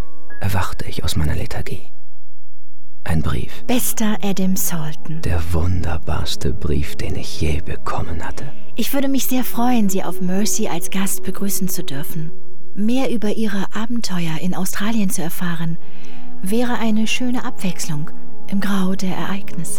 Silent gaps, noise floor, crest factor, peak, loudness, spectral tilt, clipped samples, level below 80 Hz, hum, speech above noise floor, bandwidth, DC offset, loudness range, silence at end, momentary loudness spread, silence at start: none; -56 dBFS; 14 dB; -4 dBFS; -23 LUFS; -5 dB/octave; under 0.1%; -36 dBFS; none; 34 dB; over 20 kHz; 30%; 3 LU; 0 s; 10 LU; 0.3 s